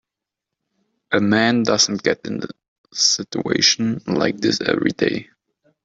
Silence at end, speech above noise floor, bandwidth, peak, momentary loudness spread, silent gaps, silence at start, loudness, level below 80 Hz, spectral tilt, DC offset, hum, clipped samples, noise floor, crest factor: 0.6 s; 65 dB; 8 kHz; -2 dBFS; 12 LU; 2.68-2.84 s; 1.1 s; -18 LUFS; -60 dBFS; -3 dB/octave; under 0.1%; none; under 0.1%; -84 dBFS; 18 dB